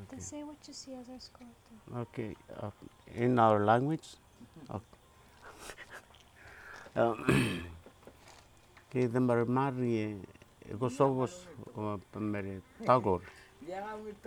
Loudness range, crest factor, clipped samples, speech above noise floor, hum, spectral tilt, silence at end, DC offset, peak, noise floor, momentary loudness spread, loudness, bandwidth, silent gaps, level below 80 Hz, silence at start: 5 LU; 24 dB; under 0.1%; 27 dB; none; -6.5 dB/octave; 0.1 s; under 0.1%; -10 dBFS; -60 dBFS; 21 LU; -33 LUFS; 18.5 kHz; none; -62 dBFS; 0 s